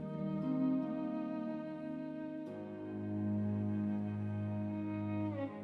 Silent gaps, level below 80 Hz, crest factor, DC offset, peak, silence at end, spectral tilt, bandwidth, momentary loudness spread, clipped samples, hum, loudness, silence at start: none; -74 dBFS; 14 dB; under 0.1%; -26 dBFS; 0 s; -10.5 dB/octave; 4.7 kHz; 8 LU; under 0.1%; none; -39 LUFS; 0 s